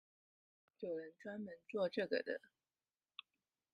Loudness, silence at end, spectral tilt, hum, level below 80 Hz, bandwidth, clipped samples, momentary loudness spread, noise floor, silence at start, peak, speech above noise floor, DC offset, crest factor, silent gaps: -44 LUFS; 1.35 s; -6.5 dB/octave; none; under -90 dBFS; 10 kHz; under 0.1%; 18 LU; under -90 dBFS; 0.8 s; -24 dBFS; over 47 dB; under 0.1%; 22 dB; none